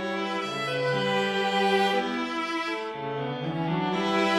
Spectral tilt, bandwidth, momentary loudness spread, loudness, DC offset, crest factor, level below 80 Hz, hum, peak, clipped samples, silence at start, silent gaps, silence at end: -5 dB/octave; 15.5 kHz; 8 LU; -27 LUFS; under 0.1%; 16 dB; -66 dBFS; none; -12 dBFS; under 0.1%; 0 s; none; 0 s